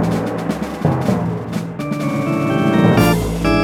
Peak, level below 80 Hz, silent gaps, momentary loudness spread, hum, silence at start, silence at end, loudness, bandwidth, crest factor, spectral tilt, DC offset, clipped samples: 0 dBFS; -34 dBFS; none; 10 LU; none; 0 s; 0 s; -17 LUFS; 16 kHz; 16 dB; -7 dB/octave; under 0.1%; under 0.1%